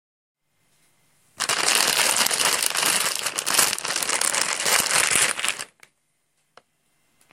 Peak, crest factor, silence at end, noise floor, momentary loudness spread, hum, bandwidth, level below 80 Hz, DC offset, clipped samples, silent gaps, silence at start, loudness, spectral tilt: 0 dBFS; 24 dB; 1.7 s; -71 dBFS; 7 LU; none; 17 kHz; -64 dBFS; under 0.1%; under 0.1%; none; 1.4 s; -20 LUFS; 1 dB/octave